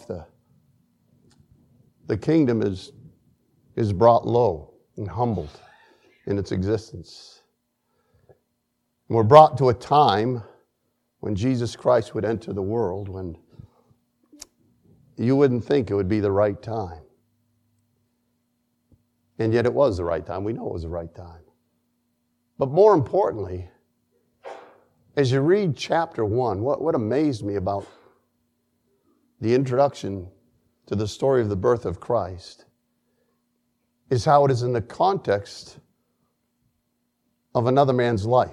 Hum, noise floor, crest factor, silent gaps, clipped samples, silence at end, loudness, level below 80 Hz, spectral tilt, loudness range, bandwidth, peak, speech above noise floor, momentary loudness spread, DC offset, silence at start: none; -74 dBFS; 24 dB; none; under 0.1%; 0 s; -22 LUFS; -54 dBFS; -7.5 dB/octave; 8 LU; 11.5 kHz; 0 dBFS; 53 dB; 18 LU; under 0.1%; 0.1 s